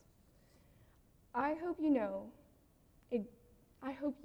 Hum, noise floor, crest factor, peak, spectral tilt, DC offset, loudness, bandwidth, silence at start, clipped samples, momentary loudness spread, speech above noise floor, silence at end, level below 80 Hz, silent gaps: none; -68 dBFS; 18 dB; -24 dBFS; -7.5 dB/octave; under 0.1%; -39 LUFS; 5.8 kHz; 1.35 s; under 0.1%; 14 LU; 31 dB; 0 s; -70 dBFS; none